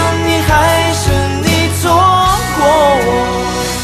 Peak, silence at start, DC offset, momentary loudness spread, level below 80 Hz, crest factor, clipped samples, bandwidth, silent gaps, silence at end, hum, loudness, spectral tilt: 0 dBFS; 0 s; under 0.1%; 5 LU; -26 dBFS; 12 dB; under 0.1%; 14 kHz; none; 0 s; none; -11 LUFS; -4.5 dB/octave